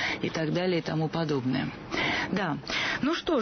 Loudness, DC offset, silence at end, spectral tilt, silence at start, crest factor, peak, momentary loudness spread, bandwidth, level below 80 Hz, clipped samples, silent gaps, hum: -29 LUFS; under 0.1%; 0 s; -5.5 dB/octave; 0 s; 12 dB; -16 dBFS; 3 LU; 6.6 kHz; -56 dBFS; under 0.1%; none; none